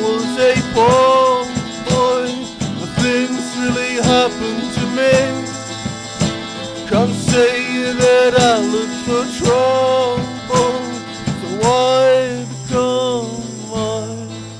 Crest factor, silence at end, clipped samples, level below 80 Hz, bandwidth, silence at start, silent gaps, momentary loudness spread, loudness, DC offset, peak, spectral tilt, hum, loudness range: 14 dB; 0 s; under 0.1%; -44 dBFS; 10.5 kHz; 0 s; none; 13 LU; -16 LUFS; under 0.1%; -2 dBFS; -4.5 dB/octave; none; 3 LU